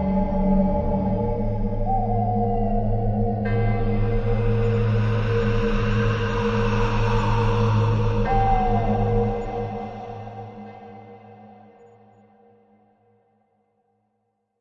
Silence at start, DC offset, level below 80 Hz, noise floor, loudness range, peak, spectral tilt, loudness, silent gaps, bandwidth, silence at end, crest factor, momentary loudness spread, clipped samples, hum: 0 s; under 0.1%; -28 dBFS; -73 dBFS; 11 LU; -8 dBFS; -8.5 dB/octave; -23 LUFS; none; 6.8 kHz; 3.15 s; 14 dB; 13 LU; under 0.1%; none